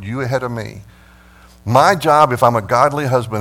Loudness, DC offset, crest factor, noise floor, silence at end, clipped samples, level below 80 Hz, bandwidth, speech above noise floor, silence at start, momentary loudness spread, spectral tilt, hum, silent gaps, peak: -14 LUFS; under 0.1%; 16 dB; -45 dBFS; 0 s; under 0.1%; -48 dBFS; 17.5 kHz; 30 dB; 0 s; 15 LU; -5.5 dB/octave; none; none; 0 dBFS